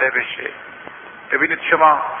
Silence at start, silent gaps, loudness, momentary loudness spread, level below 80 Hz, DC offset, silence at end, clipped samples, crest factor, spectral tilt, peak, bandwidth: 0 s; none; -17 LUFS; 22 LU; -62 dBFS; under 0.1%; 0 s; under 0.1%; 18 dB; -7 dB/octave; -2 dBFS; 3.7 kHz